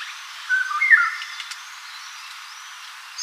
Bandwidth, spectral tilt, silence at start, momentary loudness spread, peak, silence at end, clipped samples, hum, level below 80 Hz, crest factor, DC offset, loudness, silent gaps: 15.5 kHz; 11.5 dB/octave; 0 s; 21 LU; -2 dBFS; 0 s; under 0.1%; none; under -90 dBFS; 22 dB; under 0.1%; -19 LUFS; none